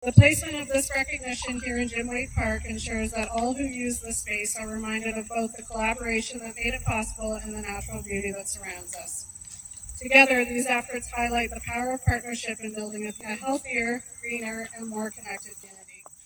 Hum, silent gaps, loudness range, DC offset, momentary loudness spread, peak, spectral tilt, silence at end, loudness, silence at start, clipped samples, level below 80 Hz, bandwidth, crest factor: none; none; 8 LU; under 0.1%; 12 LU; 0 dBFS; -4.5 dB/octave; 0 s; -27 LUFS; 0 s; under 0.1%; -44 dBFS; over 20 kHz; 28 dB